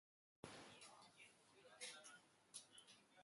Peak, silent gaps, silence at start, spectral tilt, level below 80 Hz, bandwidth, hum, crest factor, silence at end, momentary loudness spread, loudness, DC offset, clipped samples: -40 dBFS; none; 0.45 s; -1.5 dB/octave; under -90 dBFS; 11.5 kHz; none; 24 dB; 0 s; 11 LU; -61 LUFS; under 0.1%; under 0.1%